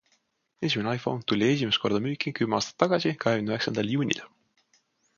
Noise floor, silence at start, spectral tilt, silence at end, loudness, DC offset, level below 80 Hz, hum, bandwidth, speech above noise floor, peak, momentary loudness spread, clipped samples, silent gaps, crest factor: -71 dBFS; 0.6 s; -5 dB/octave; 0.9 s; -27 LUFS; under 0.1%; -64 dBFS; none; 7.2 kHz; 45 dB; -4 dBFS; 5 LU; under 0.1%; none; 24 dB